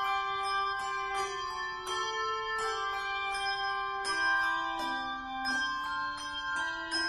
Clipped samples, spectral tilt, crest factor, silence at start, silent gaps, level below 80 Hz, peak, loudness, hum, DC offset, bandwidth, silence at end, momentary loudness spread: under 0.1%; -1 dB/octave; 14 dB; 0 s; none; -60 dBFS; -18 dBFS; -32 LUFS; none; under 0.1%; 13.5 kHz; 0 s; 6 LU